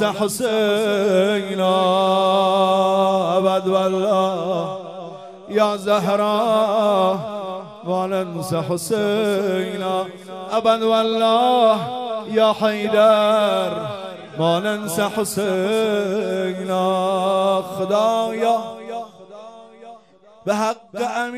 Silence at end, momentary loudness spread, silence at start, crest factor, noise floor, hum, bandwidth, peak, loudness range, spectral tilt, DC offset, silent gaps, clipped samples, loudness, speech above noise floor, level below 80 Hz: 0 s; 13 LU; 0 s; 16 dB; -48 dBFS; none; 15.5 kHz; -4 dBFS; 5 LU; -5 dB/octave; under 0.1%; none; under 0.1%; -19 LUFS; 30 dB; -68 dBFS